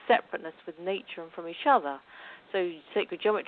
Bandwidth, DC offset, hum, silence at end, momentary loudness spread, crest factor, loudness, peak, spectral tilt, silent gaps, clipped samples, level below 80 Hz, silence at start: 4.6 kHz; under 0.1%; none; 0.05 s; 17 LU; 20 dB; -30 LUFS; -10 dBFS; -7.5 dB/octave; none; under 0.1%; -78 dBFS; 0 s